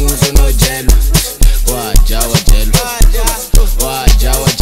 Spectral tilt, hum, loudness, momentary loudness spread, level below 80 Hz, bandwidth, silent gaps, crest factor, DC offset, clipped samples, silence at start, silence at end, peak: -3.5 dB/octave; none; -12 LUFS; 3 LU; -10 dBFS; 16.5 kHz; none; 8 dB; 2%; 0.3%; 0 s; 0 s; 0 dBFS